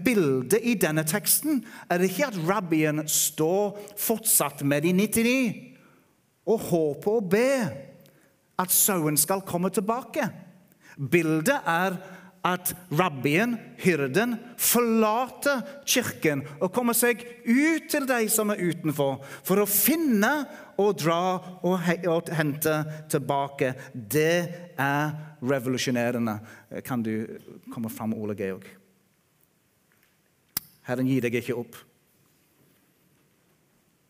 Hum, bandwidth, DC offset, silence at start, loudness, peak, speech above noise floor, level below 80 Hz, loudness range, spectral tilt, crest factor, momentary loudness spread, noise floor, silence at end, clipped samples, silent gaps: none; 16 kHz; under 0.1%; 0 s; -25 LUFS; -6 dBFS; 41 dB; -68 dBFS; 8 LU; -4 dB/octave; 22 dB; 12 LU; -66 dBFS; 2.3 s; under 0.1%; none